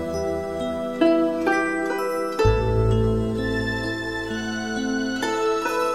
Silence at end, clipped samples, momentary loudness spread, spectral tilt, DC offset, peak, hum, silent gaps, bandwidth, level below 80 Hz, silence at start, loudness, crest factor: 0 s; under 0.1%; 7 LU; -6 dB/octave; 0.3%; -6 dBFS; none; none; 15 kHz; -34 dBFS; 0 s; -23 LUFS; 18 dB